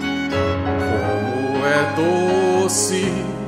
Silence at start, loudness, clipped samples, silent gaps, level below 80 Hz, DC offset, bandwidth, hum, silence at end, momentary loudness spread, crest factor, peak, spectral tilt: 0 s; -19 LUFS; under 0.1%; none; -44 dBFS; under 0.1%; 16 kHz; none; 0 s; 4 LU; 14 dB; -6 dBFS; -4.5 dB/octave